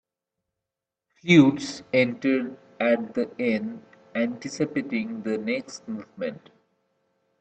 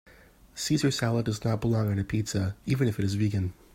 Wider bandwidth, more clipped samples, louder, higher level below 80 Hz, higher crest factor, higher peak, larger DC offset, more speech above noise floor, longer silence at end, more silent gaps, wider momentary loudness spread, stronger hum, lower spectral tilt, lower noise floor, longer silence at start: second, 8.6 kHz vs 16 kHz; neither; first, -25 LUFS vs -28 LUFS; second, -68 dBFS vs -52 dBFS; first, 22 dB vs 16 dB; first, -4 dBFS vs -12 dBFS; neither; first, 63 dB vs 28 dB; first, 1.05 s vs 0.2 s; neither; first, 18 LU vs 5 LU; neither; about the same, -6 dB/octave vs -6 dB/octave; first, -87 dBFS vs -55 dBFS; first, 1.25 s vs 0.55 s